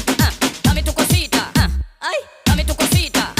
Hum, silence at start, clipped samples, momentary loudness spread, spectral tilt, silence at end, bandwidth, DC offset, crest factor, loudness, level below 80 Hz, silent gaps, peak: none; 0 s; under 0.1%; 7 LU; -4 dB/octave; 0.05 s; 16 kHz; under 0.1%; 12 dB; -17 LUFS; -24 dBFS; none; -4 dBFS